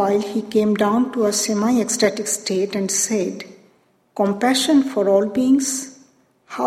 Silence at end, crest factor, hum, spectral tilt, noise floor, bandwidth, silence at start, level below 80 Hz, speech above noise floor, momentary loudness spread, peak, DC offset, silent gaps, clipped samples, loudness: 0 s; 16 dB; none; -3.5 dB/octave; -59 dBFS; 16 kHz; 0 s; -64 dBFS; 40 dB; 10 LU; -4 dBFS; under 0.1%; none; under 0.1%; -19 LUFS